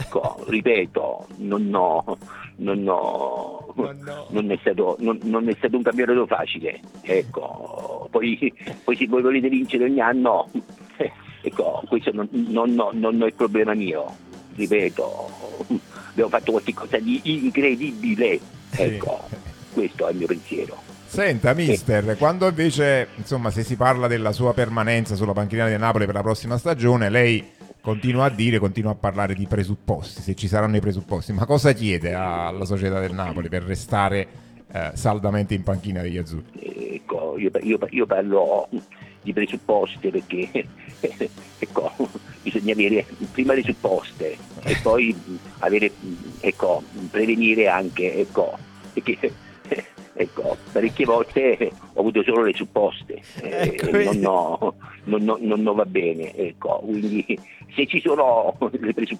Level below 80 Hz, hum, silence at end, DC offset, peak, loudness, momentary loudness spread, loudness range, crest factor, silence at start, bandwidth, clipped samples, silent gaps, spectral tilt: -50 dBFS; none; 0 s; under 0.1%; -2 dBFS; -22 LUFS; 12 LU; 4 LU; 20 dB; 0 s; 15.5 kHz; under 0.1%; none; -6.5 dB/octave